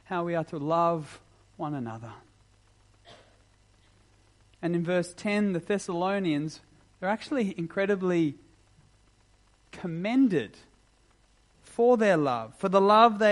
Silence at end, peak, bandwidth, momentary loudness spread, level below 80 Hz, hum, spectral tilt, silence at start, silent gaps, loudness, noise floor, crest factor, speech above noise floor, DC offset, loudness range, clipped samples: 0 s; -6 dBFS; 11.5 kHz; 17 LU; -66 dBFS; none; -6.5 dB/octave; 0.1 s; none; -27 LUFS; -63 dBFS; 24 dB; 37 dB; under 0.1%; 11 LU; under 0.1%